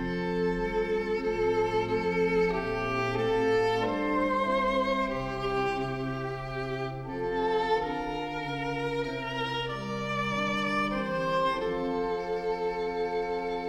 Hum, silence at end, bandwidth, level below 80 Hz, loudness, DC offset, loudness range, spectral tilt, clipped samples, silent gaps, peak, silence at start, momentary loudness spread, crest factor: none; 0 s; 12 kHz; -48 dBFS; -29 LUFS; under 0.1%; 4 LU; -6 dB/octave; under 0.1%; none; -14 dBFS; 0 s; 7 LU; 14 dB